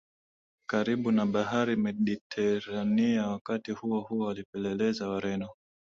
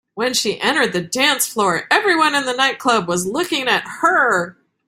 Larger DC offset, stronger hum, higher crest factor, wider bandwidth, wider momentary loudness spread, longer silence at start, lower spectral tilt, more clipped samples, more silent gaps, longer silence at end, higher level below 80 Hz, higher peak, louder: neither; neither; about the same, 16 dB vs 18 dB; second, 7.4 kHz vs 16 kHz; about the same, 7 LU vs 5 LU; first, 0.7 s vs 0.15 s; first, -6.5 dB/octave vs -2.5 dB/octave; neither; first, 2.21-2.30 s, 3.41-3.45 s, 4.45-4.53 s vs none; about the same, 0.3 s vs 0.35 s; second, -66 dBFS vs -60 dBFS; second, -14 dBFS vs 0 dBFS; second, -30 LUFS vs -17 LUFS